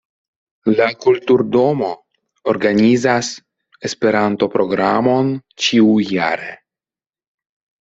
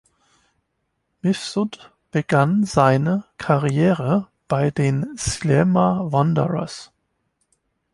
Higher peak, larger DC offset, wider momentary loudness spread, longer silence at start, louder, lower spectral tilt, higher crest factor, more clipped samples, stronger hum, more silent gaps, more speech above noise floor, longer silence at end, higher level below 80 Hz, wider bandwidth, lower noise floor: about the same, -2 dBFS vs -2 dBFS; neither; first, 12 LU vs 9 LU; second, 0.65 s vs 1.25 s; first, -16 LUFS vs -20 LUFS; second, -5 dB/octave vs -6.5 dB/octave; about the same, 16 dB vs 20 dB; neither; neither; neither; first, over 75 dB vs 54 dB; first, 1.25 s vs 1.1 s; second, -58 dBFS vs -48 dBFS; second, 8 kHz vs 11.5 kHz; first, under -90 dBFS vs -73 dBFS